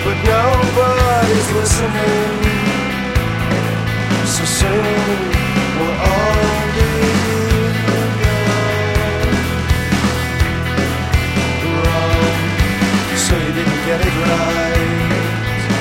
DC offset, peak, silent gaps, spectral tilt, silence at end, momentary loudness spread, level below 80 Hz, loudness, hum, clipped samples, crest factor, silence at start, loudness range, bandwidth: under 0.1%; 0 dBFS; none; -5 dB/octave; 0 s; 4 LU; -24 dBFS; -15 LUFS; none; under 0.1%; 14 dB; 0 s; 1 LU; 16.5 kHz